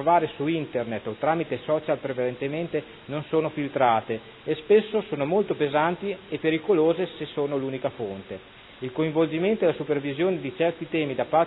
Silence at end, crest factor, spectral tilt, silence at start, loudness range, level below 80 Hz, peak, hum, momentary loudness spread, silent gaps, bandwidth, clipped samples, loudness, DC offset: 0 s; 18 dB; -10.5 dB/octave; 0 s; 3 LU; -62 dBFS; -8 dBFS; none; 10 LU; none; 4.1 kHz; under 0.1%; -26 LUFS; under 0.1%